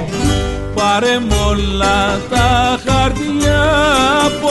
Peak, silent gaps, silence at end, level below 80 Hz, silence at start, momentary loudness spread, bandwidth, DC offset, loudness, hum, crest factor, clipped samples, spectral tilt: 0 dBFS; none; 0 s; -22 dBFS; 0 s; 5 LU; 12 kHz; under 0.1%; -14 LUFS; none; 12 dB; under 0.1%; -4.5 dB/octave